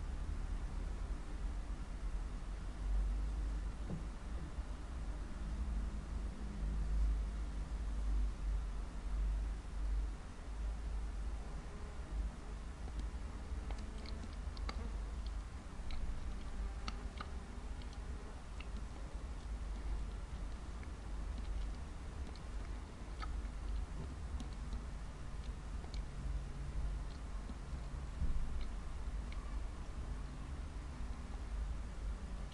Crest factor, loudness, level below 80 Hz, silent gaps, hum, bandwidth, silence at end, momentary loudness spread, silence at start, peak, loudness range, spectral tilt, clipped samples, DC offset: 16 dB; -46 LUFS; -42 dBFS; none; none; 11 kHz; 0 s; 7 LU; 0 s; -26 dBFS; 5 LU; -6 dB/octave; under 0.1%; under 0.1%